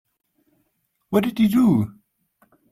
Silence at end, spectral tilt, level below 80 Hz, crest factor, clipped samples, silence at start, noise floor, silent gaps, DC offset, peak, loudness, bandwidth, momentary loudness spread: 0.8 s; -7.5 dB/octave; -58 dBFS; 18 dB; under 0.1%; 1.1 s; -71 dBFS; none; under 0.1%; -4 dBFS; -20 LUFS; 15.5 kHz; 7 LU